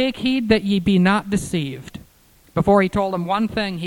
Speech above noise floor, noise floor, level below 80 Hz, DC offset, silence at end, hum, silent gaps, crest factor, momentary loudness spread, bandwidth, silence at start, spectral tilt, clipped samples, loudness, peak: 34 dB; -53 dBFS; -44 dBFS; under 0.1%; 0 s; none; none; 16 dB; 11 LU; 16 kHz; 0 s; -6 dB/octave; under 0.1%; -19 LUFS; -4 dBFS